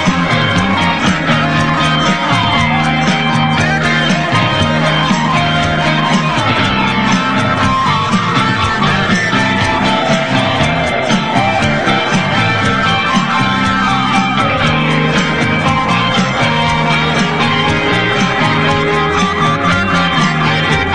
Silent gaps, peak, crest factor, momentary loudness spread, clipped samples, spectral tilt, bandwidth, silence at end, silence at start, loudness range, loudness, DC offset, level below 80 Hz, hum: none; 0 dBFS; 12 dB; 1 LU; under 0.1%; -5 dB/octave; 10.5 kHz; 0 s; 0 s; 0 LU; -12 LUFS; 2%; -34 dBFS; none